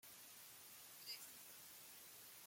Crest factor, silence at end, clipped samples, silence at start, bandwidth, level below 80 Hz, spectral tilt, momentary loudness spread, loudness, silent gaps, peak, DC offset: 18 dB; 0 s; under 0.1%; 0 s; 16.5 kHz; under -90 dBFS; 0.5 dB/octave; 5 LU; -56 LUFS; none; -40 dBFS; under 0.1%